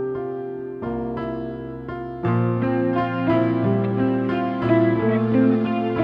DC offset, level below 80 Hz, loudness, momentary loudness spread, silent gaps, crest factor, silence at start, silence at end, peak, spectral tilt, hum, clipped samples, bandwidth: under 0.1%; -50 dBFS; -22 LUFS; 12 LU; none; 14 dB; 0 s; 0 s; -6 dBFS; -10.5 dB/octave; none; under 0.1%; 5.4 kHz